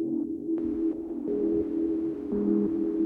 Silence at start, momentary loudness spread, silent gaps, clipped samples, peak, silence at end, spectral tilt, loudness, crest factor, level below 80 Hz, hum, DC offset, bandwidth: 0 s; 5 LU; none; under 0.1%; -16 dBFS; 0 s; -11 dB/octave; -29 LUFS; 12 dB; -56 dBFS; none; under 0.1%; 2.7 kHz